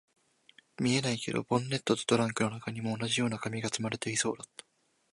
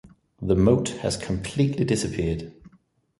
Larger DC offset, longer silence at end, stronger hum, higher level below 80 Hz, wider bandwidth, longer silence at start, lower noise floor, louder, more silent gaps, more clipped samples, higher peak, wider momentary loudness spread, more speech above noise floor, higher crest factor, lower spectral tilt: neither; first, 0.7 s vs 0.5 s; neither; second, -68 dBFS vs -42 dBFS; about the same, 11.5 kHz vs 11.5 kHz; first, 0.8 s vs 0.05 s; about the same, -63 dBFS vs -62 dBFS; second, -31 LUFS vs -24 LUFS; neither; neither; second, -12 dBFS vs -4 dBFS; second, 7 LU vs 12 LU; second, 31 dB vs 38 dB; about the same, 22 dB vs 20 dB; second, -4 dB/octave vs -6 dB/octave